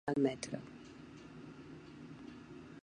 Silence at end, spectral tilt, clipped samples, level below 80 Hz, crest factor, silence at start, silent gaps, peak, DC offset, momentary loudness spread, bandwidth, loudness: 0.05 s; -5.5 dB/octave; under 0.1%; -70 dBFS; 22 dB; 0.05 s; none; -20 dBFS; under 0.1%; 18 LU; 10 kHz; -44 LUFS